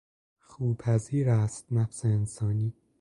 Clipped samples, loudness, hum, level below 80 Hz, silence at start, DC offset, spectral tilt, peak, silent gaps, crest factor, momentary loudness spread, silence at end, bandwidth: under 0.1%; -29 LUFS; none; -54 dBFS; 0.6 s; under 0.1%; -8 dB/octave; -14 dBFS; none; 16 dB; 5 LU; 0.3 s; 11 kHz